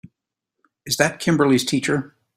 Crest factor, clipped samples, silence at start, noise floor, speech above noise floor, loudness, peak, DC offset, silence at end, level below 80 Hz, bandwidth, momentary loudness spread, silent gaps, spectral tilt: 22 dB; under 0.1%; 0.85 s; -81 dBFS; 62 dB; -20 LUFS; 0 dBFS; under 0.1%; 0.3 s; -58 dBFS; 16 kHz; 8 LU; none; -4.5 dB/octave